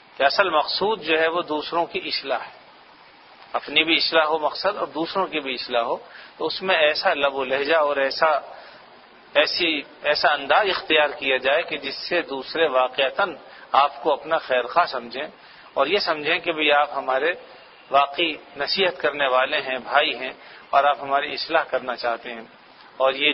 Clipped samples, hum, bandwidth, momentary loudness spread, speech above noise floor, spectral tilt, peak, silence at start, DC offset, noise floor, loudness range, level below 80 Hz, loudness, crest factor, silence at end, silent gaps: under 0.1%; none; 6 kHz; 10 LU; 27 dB; -5.5 dB/octave; -2 dBFS; 0.2 s; under 0.1%; -49 dBFS; 2 LU; -64 dBFS; -22 LUFS; 22 dB; 0 s; none